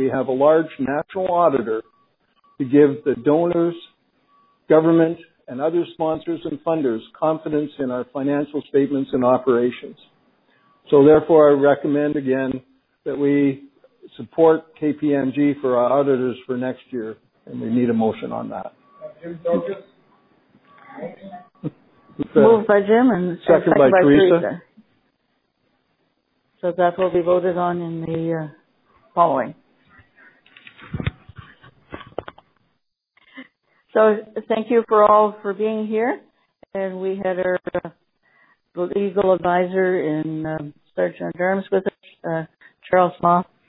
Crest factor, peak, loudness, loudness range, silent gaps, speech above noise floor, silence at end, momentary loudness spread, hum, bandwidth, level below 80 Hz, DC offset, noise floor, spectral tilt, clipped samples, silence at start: 20 dB; -2 dBFS; -19 LUFS; 9 LU; none; 53 dB; 0.25 s; 20 LU; none; 4.1 kHz; -56 dBFS; under 0.1%; -72 dBFS; -11.5 dB/octave; under 0.1%; 0 s